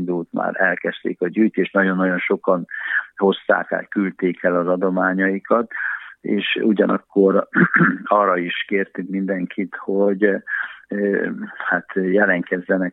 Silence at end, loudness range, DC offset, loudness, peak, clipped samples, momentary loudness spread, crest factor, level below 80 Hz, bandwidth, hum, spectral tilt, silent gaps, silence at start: 0 s; 3 LU; under 0.1%; -20 LUFS; -2 dBFS; under 0.1%; 8 LU; 18 dB; -74 dBFS; 4 kHz; none; -9.5 dB/octave; none; 0 s